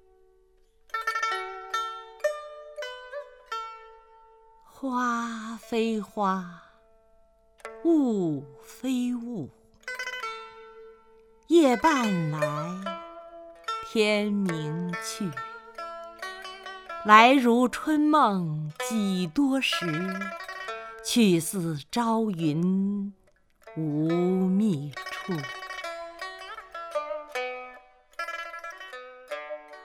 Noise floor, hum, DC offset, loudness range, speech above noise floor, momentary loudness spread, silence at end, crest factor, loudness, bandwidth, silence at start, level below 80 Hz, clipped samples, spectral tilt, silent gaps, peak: -62 dBFS; none; under 0.1%; 12 LU; 37 dB; 18 LU; 0 s; 26 dB; -27 LUFS; 17.5 kHz; 0.95 s; -64 dBFS; under 0.1%; -5 dB/octave; none; -2 dBFS